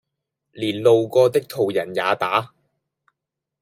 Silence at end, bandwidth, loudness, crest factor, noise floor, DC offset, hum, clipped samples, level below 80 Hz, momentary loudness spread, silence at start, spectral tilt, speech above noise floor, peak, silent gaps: 1.15 s; 16 kHz; -20 LUFS; 18 dB; -84 dBFS; under 0.1%; none; under 0.1%; -72 dBFS; 10 LU; 0.55 s; -5.5 dB/octave; 65 dB; -4 dBFS; none